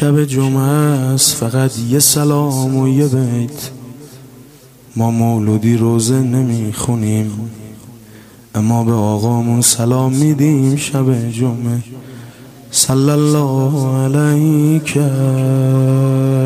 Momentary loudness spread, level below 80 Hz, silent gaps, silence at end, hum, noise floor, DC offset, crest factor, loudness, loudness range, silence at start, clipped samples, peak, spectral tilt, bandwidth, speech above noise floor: 11 LU; -50 dBFS; none; 0 s; none; -41 dBFS; under 0.1%; 14 dB; -14 LUFS; 4 LU; 0 s; under 0.1%; 0 dBFS; -5.5 dB/octave; 16 kHz; 28 dB